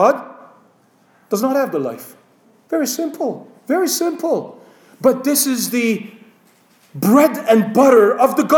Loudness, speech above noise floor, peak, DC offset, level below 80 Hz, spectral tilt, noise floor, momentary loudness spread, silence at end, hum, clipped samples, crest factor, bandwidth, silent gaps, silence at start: -16 LUFS; 39 dB; -2 dBFS; under 0.1%; -68 dBFS; -4.5 dB/octave; -55 dBFS; 14 LU; 0 s; none; under 0.1%; 16 dB; over 20 kHz; none; 0 s